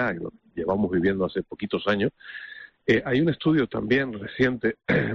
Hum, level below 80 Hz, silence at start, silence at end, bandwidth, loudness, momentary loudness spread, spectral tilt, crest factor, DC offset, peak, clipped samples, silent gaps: none; -54 dBFS; 0 s; 0 s; 7.2 kHz; -25 LUFS; 13 LU; -5 dB/octave; 16 dB; under 0.1%; -8 dBFS; under 0.1%; none